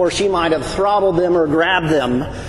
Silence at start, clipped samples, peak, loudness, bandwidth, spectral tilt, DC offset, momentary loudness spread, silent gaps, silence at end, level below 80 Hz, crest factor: 0 s; under 0.1%; -4 dBFS; -16 LUFS; 12 kHz; -5 dB/octave; under 0.1%; 3 LU; none; 0 s; -38 dBFS; 12 dB